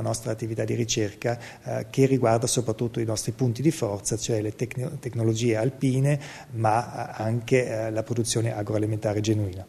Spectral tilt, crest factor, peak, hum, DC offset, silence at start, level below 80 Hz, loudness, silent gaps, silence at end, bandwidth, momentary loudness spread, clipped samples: -5.5 dB/octave; 18 dB; -8 dBFS; none; under 0.1%; 0 s; -56 dBFS; -26 LUFS; none; 0 s; 13.5 kHz; 8 LU; under 0.1%